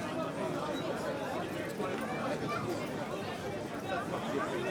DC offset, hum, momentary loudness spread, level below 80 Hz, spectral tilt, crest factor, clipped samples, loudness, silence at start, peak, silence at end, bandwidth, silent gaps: under 0.1%; none; 3 LU; -64 dBFS; -5.5 dB/octave; 14 dB; under 0.1%; -36 LUFS; 0 s; -22 dBFS; 0 s; over 20 kHz; none